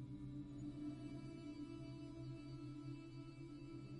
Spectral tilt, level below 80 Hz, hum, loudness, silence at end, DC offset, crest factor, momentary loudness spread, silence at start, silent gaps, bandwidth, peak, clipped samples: -8 dB/octave; -66 dBFS; none; -53 LUFS; 0 s; under 0.1%; 12 dB; 4 LU; 0 s; none; 10.5 kHz; -38 dBFS; under 0.1%